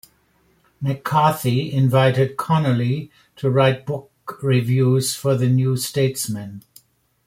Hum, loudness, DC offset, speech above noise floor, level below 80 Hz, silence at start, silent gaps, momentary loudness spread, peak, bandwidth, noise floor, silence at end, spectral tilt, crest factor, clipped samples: none; -20 LUFS; under 0.1%; 42 dB; -56 dBFS; 0.8 s; none; 11 LU; -2 dBFS; 16 kHz; -61 dBFS; 0.65 s; -6 dB/octave; 18 dB; under 0.1%